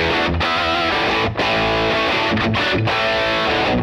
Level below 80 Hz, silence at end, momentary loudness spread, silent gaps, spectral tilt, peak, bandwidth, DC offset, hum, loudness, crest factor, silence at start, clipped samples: -38 dBFS; 0 s; 1 LU; none; -5 dB/octave; -8 dBFS; 14 kHz; under 0.1%; none; -17 LUFS; 10 dB; 0 s; under 0.1%